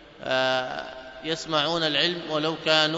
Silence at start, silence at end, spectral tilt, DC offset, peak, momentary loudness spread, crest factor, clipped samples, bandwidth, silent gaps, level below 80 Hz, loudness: 0 s; 0 s; -3.5 dB/octave; under 0.1%; -4 dBFS; 12 LU; 22 dB; under 0.1%; 8 kHz; none; -60 dBFS; -24 LUFS